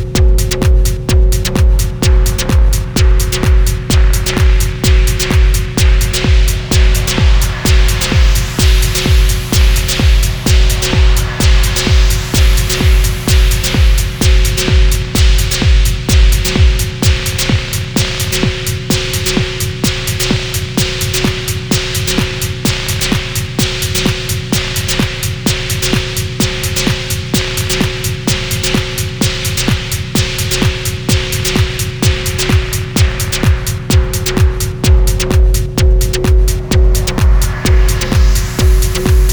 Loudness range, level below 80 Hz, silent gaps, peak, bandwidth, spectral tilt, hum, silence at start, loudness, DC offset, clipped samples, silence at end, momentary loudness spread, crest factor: 3 LU; -12 dBFS; none; 0 dBFS; over 20 kHz; -4 dB/octave; none; 0 s; -13 LUFS; under 0.1%; under 0.1%; 0 s; 4 LU; 10 dB